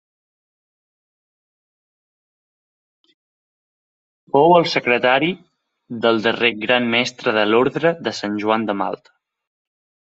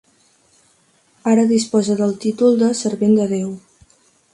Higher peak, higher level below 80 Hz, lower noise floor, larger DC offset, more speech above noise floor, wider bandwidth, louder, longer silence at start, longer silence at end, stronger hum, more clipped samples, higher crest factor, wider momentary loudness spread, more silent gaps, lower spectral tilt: first, 0 dBFS vs -4 dBFS; about the same, -66 dBFS vs -62 dBFS; first, under -90 dBFS vs -58 dBFS; neither; first, over 72 dB vs 42 dB; second, 8 kHz vs 11.5 kHz; about the same, -18 LUFS vs -17 LUFS; first, 4.35 s vs 1.25 s; first, 1.2 s vs 0.75 s; neither; neither; first, 22 dB vs 16 dB; about the same, 10 LU vs 10 LU; neither; about the same, -5 dB/octave vs -6 dB/octave